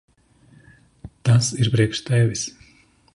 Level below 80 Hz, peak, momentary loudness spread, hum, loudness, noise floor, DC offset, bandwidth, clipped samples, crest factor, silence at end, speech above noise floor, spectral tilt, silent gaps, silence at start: -52 dBFS; -6 dBFS; 9 LU; none; -20 LUFS; -55 dBFS; under 0.1%; 11.5 kHz; under 0.1%; 16 dB; 0.65 s; 36 dB; -5 dB/octave; none; 1.05 s